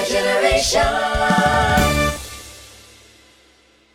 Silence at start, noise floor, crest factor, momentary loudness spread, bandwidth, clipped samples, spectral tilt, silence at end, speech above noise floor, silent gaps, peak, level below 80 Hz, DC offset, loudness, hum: 0 s; -54 dBFS; 16 dB; 16 LU; 17 kHz; under 0.1%; -3.5 dB/octave; 1.3 s; 37 dB; none; -2 dBFS; -32 dBFS; under 0.1%; -17 LUFS; none